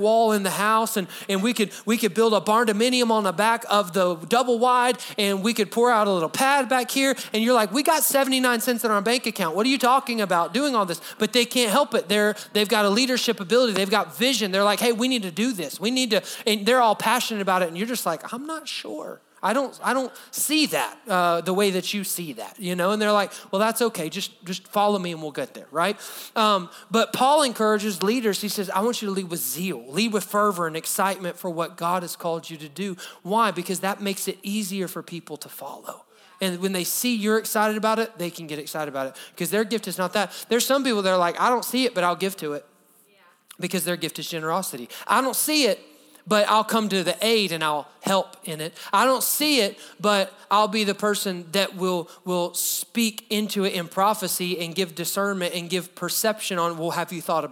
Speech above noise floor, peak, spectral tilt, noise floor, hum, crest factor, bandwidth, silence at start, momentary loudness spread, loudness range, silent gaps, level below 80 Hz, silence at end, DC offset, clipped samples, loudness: 35 dB; -4 dBFS; -3 dB/octave; -58 dBFS; none; 20 dB; over 20 kHz; 0 s; 11 LU; 5 LU; none; -82 dBFS; 0 s; under 0.1%; under 0.1%; -23 LUFS